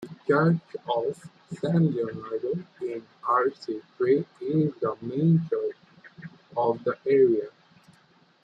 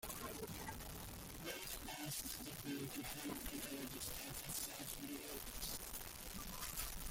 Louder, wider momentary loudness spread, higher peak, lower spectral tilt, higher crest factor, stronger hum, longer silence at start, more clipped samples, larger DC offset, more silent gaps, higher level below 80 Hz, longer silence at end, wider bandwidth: first, -26 LUFS vs -47 LUFS; first, 13 LU vs 5 LU; first, -10 dBFS vs -26 dBFS; first, -9 dB/octave vs -2.5 dB/octave; second, 16 dB vs 22 dB; neither; about the same, 0 s vs 0 s; neither; neither; neither; second, -70 dBFS vs -58 dBFS; first, 0.95 s vs 0 s; second, 7.8 kHz vs 17 kHz